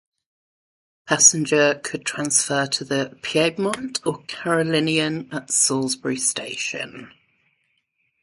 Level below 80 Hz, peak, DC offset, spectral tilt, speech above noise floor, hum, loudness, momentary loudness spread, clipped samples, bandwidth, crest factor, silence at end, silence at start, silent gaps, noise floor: -66 dBFS; 0 dBFS; under 0.1%; -2.5 dB/octave; 49 dB; none; -20 LUFS; 13 LU; under 0.1%; 11.5 kHz; 22 dB; 1.15 s; 1.05 s; none; -70 dBFS